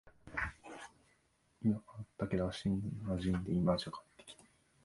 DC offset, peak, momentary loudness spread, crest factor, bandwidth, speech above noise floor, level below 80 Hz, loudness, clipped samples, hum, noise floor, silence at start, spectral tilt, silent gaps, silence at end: under 0.1%; -18 dBFS; 21 LU; 22 dB; 11.5 kHz; 39 dB; -56 dBFS; -38 LUFS; under 0.1%; none; -74 dBFS; 0.05 s; -7 dB/octave; none; 0.5 s